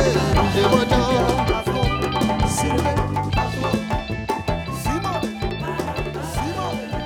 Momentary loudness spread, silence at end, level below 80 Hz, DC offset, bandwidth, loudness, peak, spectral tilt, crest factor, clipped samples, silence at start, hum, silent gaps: 8 LU; 0 s; -32 dBFS; under 0.1%; 19.5 kHz; -21 LUFS; -2 dBFS; -5.5 dB/octave; 18 dB; under 0.1%; 0 s; none; none